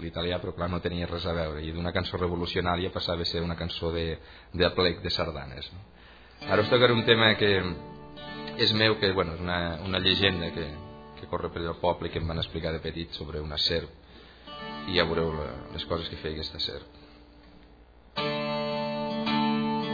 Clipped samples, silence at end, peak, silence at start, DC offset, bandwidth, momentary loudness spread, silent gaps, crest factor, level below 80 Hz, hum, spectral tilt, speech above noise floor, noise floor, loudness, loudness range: under 0.1%; 0 s; -4 dBFS; 0 s; under 0.1%; 5 kHz; 17 LU; none; 24 dB; -46 dBFS; none; -6.5 dB/octave; 26 dB; -54 dBFS; -28 LUFS; 8 LU